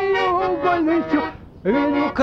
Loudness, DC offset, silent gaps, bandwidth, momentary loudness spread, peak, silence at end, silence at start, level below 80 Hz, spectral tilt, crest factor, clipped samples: -20 LUFS; under 0.1%; none; 6.6 kHz; 5 LU; -6 dBFS; 0 s; 0 s; -46 dBFS; -7 dB/octave; 12 dB; under 0.1%